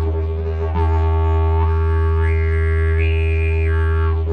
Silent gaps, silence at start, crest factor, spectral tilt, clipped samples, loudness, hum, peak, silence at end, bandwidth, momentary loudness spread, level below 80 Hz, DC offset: none; 0 s; 8 dB; -9 dB/octave; under 0.1%; -18 LUFS; none; -8 dBFS; 0 s; 4 kHz; 4 LU; -20 dBFS; under 0.1%